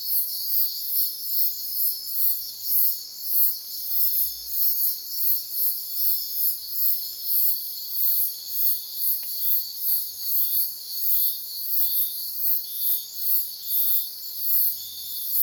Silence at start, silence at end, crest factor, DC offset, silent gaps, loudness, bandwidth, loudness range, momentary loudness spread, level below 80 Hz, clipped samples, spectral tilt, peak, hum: 0 s; 0 s; 18 dB; under 0.1%; none; -21 LUFS; over 20 kHz; 1 LU; 5 LU; -70 dBFS; under 0.1%; 2.5 dB/octave; -6 dBFS; none